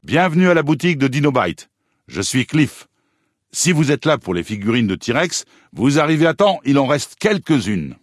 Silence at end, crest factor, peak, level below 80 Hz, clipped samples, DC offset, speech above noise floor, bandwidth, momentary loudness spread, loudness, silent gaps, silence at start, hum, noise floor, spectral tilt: 0.1 s; 16 dB; -2 dBFS; -54 dBFS; under 0.1%; under 0.1%; 51 dB; 12 kHz; 9 LU; -17 LUFS; none; 0.05 s; none; -68 dBFS; -5 dB/octave